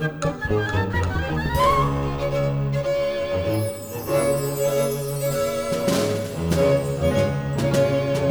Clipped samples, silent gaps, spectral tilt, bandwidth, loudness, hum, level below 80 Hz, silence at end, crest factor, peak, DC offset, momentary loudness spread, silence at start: under 0.1%; none; -6 dB/octave; over 20 kHz; -23 LUFS; none; -38 dBFS; 0 s; 14 dB; -8 dBFS; under 0.1%; 5 LU; 0 s